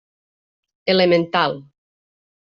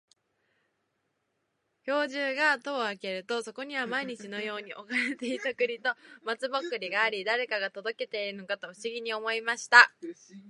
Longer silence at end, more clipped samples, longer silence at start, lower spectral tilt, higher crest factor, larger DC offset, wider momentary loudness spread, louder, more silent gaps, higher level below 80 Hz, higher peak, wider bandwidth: first, 0.9 s vs 0 s; neither; second, 0.85 s vs 1.85 s; about the same, -3 dB/octave vs -2 dB/octave; second, 18 dB vs 28 dB; neither; about the same, 12 LU vs 12 LU; first, -18 LUFS vs -29 LUFS; neither; first, -64 dBFS vs -88 dBFS; about the same, -4 dBFS vs -2 dBFS; second, 6.8 kHz vs 11.5 kHz